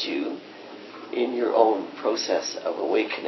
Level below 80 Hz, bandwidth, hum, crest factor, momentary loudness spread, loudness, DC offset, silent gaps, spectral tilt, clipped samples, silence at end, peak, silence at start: -86 dBFS; 6.2 kHz; none; 22 dB; 20 LU; -25 LUFS; under 0.1%; none; -3 dB/octave; under 0.1%; 0 s; -4 dBFS; 0 s